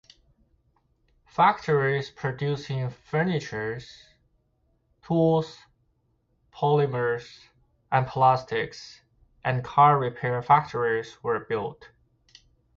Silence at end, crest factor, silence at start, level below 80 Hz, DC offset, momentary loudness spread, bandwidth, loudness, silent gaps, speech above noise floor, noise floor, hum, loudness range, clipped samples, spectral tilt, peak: 1.05 s; 20 dB; 1.4 s; -60 dBFS; under 0.1%; 12 LU; 7.4 kHz; -25 LUFS; none; 45 dB; -70 dBFS; none; 6 LU; under 0.1%; -7 dB/octave; -6 dBFS